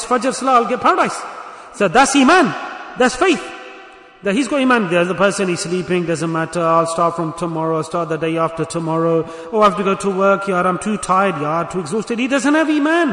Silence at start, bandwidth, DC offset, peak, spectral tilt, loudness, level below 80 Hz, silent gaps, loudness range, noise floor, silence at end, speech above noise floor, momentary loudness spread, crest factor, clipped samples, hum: 0 s; 11 kHz; under 0.1%; -2 dBFS; -4.5 dB/octave; -16 LUFS; -52 dBFS; none; 3 LU; -40 dBFS; 0 s; 24 dB; 9 LU; 14 dB; under 0.1%; none